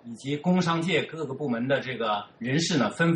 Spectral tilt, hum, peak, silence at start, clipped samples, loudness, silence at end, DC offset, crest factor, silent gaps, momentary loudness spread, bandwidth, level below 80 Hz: -5.5 dB/octave; none; -12 dBFS; 0.05 s; under 0.1%; -27 LUFS; 0 s; under 0.1%; 14 dB; none; 7 LU; 10 kHz; -66 dBFS